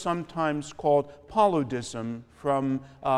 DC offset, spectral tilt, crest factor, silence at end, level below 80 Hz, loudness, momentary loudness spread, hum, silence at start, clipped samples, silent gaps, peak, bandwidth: under 0.1%; -6 dB/octave; 18 dB; 0 s; -58 dBFS; -28 LUFS; 10 LU; none; 0 s; under 0.1%; none; -10 dBFS; 12 kHz